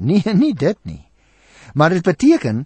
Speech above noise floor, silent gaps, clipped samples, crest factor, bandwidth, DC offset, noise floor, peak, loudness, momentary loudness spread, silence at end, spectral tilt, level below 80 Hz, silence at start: 37 dB; none; under 0.1%; 14 dB; 8.8 kHz; under 0.1%; -52 dBFS; -2 dBFS; -16 LUFS; 13 LU; 0 s; -7 dB/octave; -48 dBFS; 0 s